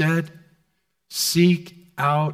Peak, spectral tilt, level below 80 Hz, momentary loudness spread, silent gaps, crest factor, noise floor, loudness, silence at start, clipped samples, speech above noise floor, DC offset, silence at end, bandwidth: -6 dBFS; -5 dB/octave; -62 dBFS; 17 LU; none; 16 dB; -71 dBFS; -21 LUFS; 0 s; under 0.1%; 51 dB; under 0.1%; 0 s; 16.5 kHz